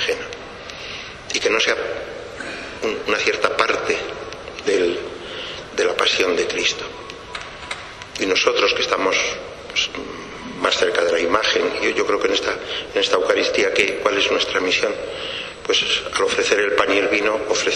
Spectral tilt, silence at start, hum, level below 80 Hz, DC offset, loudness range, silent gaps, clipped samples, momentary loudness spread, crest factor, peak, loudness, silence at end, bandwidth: -2 dB/octave; 0 s; none; -50 dBFS; under 0.1%; 3 LU; none; under 0.1%; 14 LU; 20 dB; -2 dBFS; -19 LUFS; 0 s; 12.5 kHz